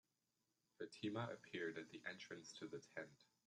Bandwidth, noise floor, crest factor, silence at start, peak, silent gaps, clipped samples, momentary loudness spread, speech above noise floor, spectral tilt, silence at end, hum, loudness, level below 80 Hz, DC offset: 11.5 kHz; -89 dBFS; 18 dB; 0.8 s; -34 dBFS; none; under 0.1%; 8 LU; 38 dB; -5 dB/octave; 0.2 s; none; -52 LUFS; under -90 dBFS; under 0.1%